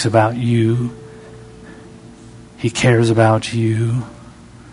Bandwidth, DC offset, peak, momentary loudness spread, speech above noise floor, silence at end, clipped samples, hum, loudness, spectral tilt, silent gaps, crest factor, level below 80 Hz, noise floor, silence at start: 11 kHz; under 0.1%; 0 dBFS; 25 LU; 25 dB; 0 s; under 0.1%; 60 Hz at -35 dBFS; -16 LUFS; -6.5 dB/octave; none; 18 dB; -48 dBFS; -40 dBFS; 0 s